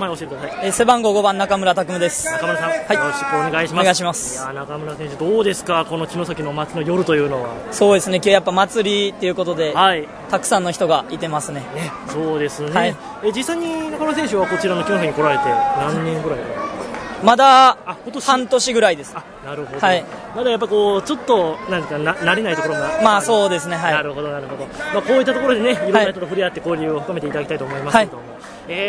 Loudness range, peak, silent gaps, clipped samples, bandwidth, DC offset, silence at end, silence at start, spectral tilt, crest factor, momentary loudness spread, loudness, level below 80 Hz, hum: 5 LU; 0 dBFS; none; under 0.1%; 11 kHz; under 0.1%; 0 s; 0 s; -4 dB/octave; 18 dB; 12 LU; -18 LUFS; -52 dBFS; none